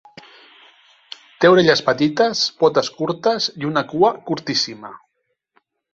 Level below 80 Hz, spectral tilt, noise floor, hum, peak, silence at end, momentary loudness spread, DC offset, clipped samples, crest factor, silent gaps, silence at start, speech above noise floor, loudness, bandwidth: -60 dBFS; -4.5 dB/octave; -73 dBFS; none; -2 dBFS; 0.95 s; 23 LU; under 0.1%; under 0.1%; 18 dB; none; 1.4 s; 55 dB; -18 LUFS; 7.8 kHz